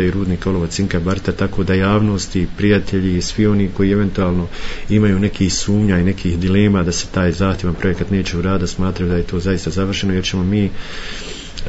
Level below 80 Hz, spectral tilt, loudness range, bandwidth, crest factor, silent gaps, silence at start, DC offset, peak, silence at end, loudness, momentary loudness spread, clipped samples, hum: -30 dBFS; -6 dB/octave; 2 LU; 8 kHz; 14 dB; none; 0 s; under 0.1%; -2 dBFS; 0 s; -17 LUFS; 5 LU; under 0.1%; none